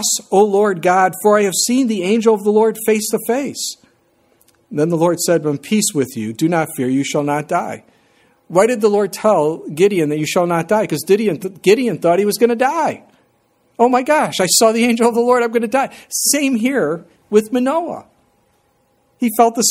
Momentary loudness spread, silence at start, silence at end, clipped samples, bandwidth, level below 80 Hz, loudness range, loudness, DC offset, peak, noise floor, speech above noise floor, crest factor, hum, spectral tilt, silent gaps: 7 LU; 0 s; 0 s; under 0.1%; 16.5 kHz; -62 dBFS; 4 LU; -16 LUFS; under 0.1%; 0 dBFS; -60 dBFS; 45 dB; 16 dB; none; -4 dB/octave; none